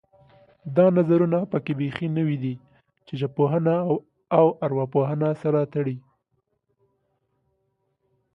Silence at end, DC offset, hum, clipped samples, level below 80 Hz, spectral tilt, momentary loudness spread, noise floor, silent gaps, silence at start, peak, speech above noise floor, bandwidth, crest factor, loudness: 2.35 s; under 0.1%; none; under 0.1%; -66 dBFS; -10.5 dB/octave; 11 LU; -74 dBFS; none; 0.65 s; -4 dBFS; 52 dB; 5.4 kHz; 20 dB; -23 LUFS